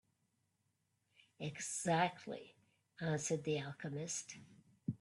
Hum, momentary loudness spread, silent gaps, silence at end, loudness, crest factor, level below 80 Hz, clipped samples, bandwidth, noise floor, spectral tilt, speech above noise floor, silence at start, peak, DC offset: none; 14 LU; none; 0.05 s; -41 LUFS; 22 dB; -80 dBFS; under 0.1%; 12 kHz; -83 dBFS; -4 dB/octave; 42 dB; 1.4 s; -20 dBFS; under 0.1%